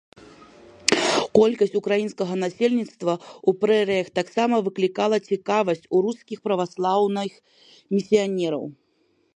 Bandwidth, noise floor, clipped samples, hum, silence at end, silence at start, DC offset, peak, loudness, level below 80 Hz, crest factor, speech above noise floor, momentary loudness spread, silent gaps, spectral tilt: 11.5 kHz; -66 dBFS; under 0.1%; none; 0.65 s; 0.85 s; under 0.1%; 0 dBFS; -23 LUFS; -68 dBFS; 24 dB; 43 dB; 8 LU; none; -4.5 dB/octave